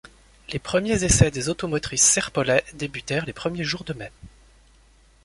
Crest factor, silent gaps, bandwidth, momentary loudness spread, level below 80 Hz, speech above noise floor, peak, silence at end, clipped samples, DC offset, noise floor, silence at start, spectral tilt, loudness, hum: 22 dB; none; 11.5 kHz; 16 LU; -40 dBFS; 32 dB; -2 dBFS; 0.95 s; under 0.1%; under 0.1%; -55 dBFS; 0.5 s; -3.5 dB/octave; -22 LUFS; none